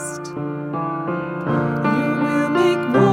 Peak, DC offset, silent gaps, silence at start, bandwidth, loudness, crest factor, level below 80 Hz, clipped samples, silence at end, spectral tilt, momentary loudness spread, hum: -4 dBFS; under 0.1%; none; 0 s; 14.5 kHz; -20 LUFS; 16 dB; -56 dBFS; under 0.1%; 0 s; -6.5 dB/octave; 10 LU; none